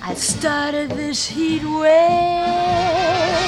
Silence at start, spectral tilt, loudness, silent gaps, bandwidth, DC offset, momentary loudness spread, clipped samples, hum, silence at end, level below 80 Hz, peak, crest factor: 0 s; -3.5 dB/octave; -18 LUFS; none; 13 kHz; under 0.1%; 8 LU; under 0.1%; none; 0 s; -44 dBFS; -4 dBFS; 14 dB